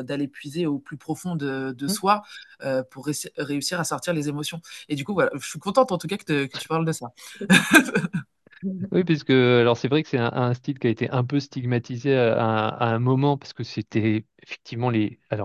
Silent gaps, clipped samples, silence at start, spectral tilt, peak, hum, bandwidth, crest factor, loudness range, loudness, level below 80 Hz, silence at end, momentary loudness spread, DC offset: none; under 0.1%; 0 s; -5.5 dB/octave; 0 dBFS; none; 12.5 kHz; 24 dB; 6 LU; -24 LUFS; -62 dBFS; 0 s; 13 LU; under 0.1%